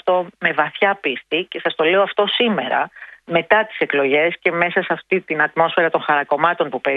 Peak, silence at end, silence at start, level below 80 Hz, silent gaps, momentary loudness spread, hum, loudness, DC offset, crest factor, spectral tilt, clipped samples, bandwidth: 0 dBFS; 0 s; 0.05 s; -66 dBFS; none; 6 LU; none; -18 LUFS; under 0.1%; 18 dB; -7 dB/octave; under 0.1%; 5 kHz